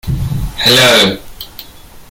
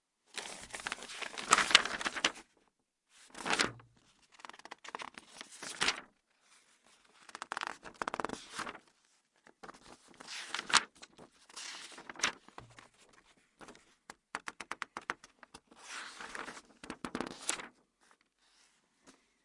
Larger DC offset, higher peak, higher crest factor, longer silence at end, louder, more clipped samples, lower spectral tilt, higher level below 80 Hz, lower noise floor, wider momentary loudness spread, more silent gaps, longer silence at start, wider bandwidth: neither; about the same, 0 dBFS vs -2 dBFS; second, 14 dB vs 40 dB; second, 0.1 s vs 0.35 s; first, -9 LUFS vs -36 LUFS; neither; first, -3 dB/octave vs 0 dB/octave; first, -28 dBFS vs -72 dBFS; second, -35 dBFS vs -77 dBFS; second, 23 LU vs 26 LU; neither; second, 0.05 s vs 0.35 s; first, 17.5 kHz vs 11.5 kHz